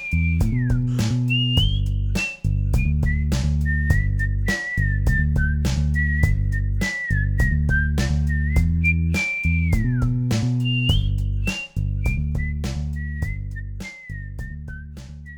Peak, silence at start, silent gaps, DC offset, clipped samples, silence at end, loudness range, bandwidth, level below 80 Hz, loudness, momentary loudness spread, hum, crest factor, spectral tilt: -4 dBFS; 0 s; none; under 0.1%; under 0.1%; 0 s; 6 LU; 18 kHz; -24 dBFS; -22 LUFS; 12 LU; none; 16 dB; -5.5 dB/octave